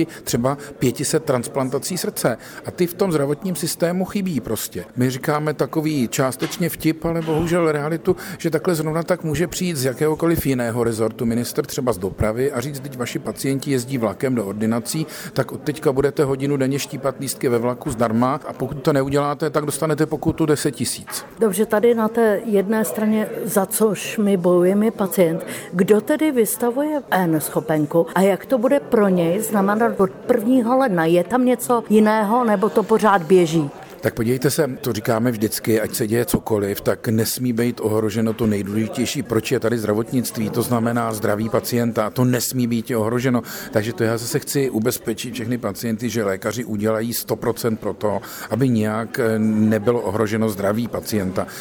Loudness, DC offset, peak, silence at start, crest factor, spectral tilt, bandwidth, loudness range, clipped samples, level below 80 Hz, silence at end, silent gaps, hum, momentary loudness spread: -20 LUFS; under 0.1%; -4 dBFS; 0 s; 16 dB; -5.5 dB/octave; over 20 kHz; 5 LU; under 0.1%; -48 dBFS; 0 s; none; none; 7 LU